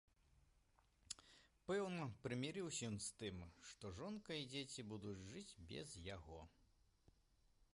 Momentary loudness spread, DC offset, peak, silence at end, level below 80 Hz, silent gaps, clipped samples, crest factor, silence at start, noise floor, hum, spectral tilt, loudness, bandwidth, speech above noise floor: 12 LU; under 0.1%; -32 dBFS; 0.1 s; -70 dBFS; none; under 0.1%; 20 dB; 0.8 s; -78 dBFS; none; -4 dB/octave; -50 LUFS; 11.5 kHz; 28 dB